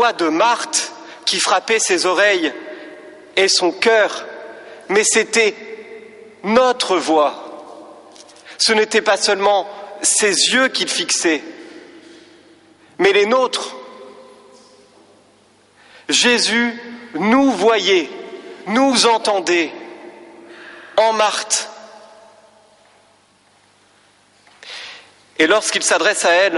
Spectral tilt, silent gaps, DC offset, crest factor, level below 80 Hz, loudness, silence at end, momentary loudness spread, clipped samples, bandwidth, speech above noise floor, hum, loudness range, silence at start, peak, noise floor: -1.5 dB/octave; none; under 0.1%; 16 dB; -64 dBFS; -15 LUFS; 0 s; 21 LU; under 0.1%; 11.5 kHz; 39 dB; none; 6 LU; 0 s; -2 dBFS; -54 dBFS